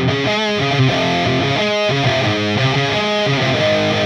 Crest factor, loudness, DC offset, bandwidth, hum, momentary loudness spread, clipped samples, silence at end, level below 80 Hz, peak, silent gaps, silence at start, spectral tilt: 14 dB; -16 LUFS; under 0.1%; 10 kHz; none; 1 LU; under 0.1%; 0 s; -46 dBFS; -2 dBFS; none; 0 s; -5 dB/octave